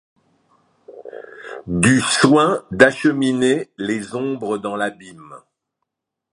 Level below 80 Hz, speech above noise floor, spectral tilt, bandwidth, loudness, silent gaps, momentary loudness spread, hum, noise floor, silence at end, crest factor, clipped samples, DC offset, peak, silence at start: -52 dBFS; 61 dB; -4.5 dB/octave; 11.5 kHz; -17 LUFS; none; 22 LU; none; -79 dBFS; 0.95 s; 20 dB; under 0.1%; under 0.1%; 0 dBFS; 0.9 s